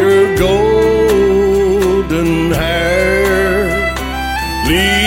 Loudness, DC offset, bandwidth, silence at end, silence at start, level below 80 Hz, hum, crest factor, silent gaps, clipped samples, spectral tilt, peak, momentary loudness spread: -12 LUFS; under 0.1%; 17 kHz; 0 s; 0 s; -24 dBFS; none; 12 dB; none; under 0.1%; -5 dB/octave; 0 dBFS; 6 LU